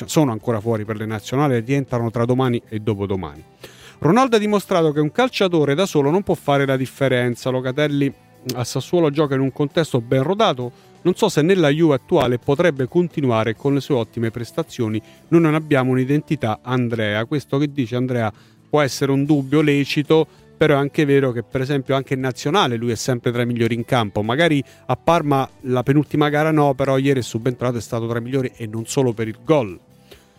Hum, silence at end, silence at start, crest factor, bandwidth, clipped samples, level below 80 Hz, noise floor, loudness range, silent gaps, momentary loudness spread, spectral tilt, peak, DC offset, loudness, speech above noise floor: none; 0.25 s; 0 s; 16 dB; 16 kHz; under 0.1%; -54 dBFS; -48 dBFS; 3 LU; none; 8 LU; -6.5 dB/octave; -4 dBFS; under 0.1%; -19 LUFS; 29 dB